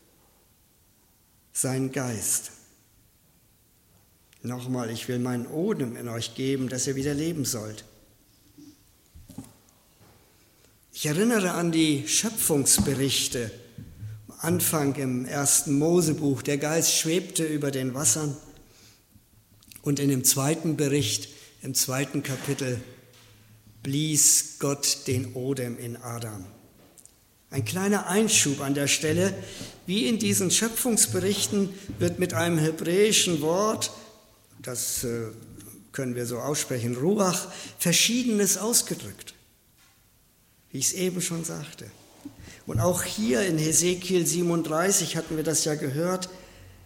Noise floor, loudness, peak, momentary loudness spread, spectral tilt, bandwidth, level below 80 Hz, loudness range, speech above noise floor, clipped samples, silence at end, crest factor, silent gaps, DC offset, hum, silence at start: -62 dBFS; -25 LUFS; -4 dBFS; 18 LU; -3.5 dB/octave; 16.5 kHz; -58 dBFS; 8 LU; 36 dB; under 0.1%; 0 s; 22 dB; none; under 0.1%; none; 1.55 s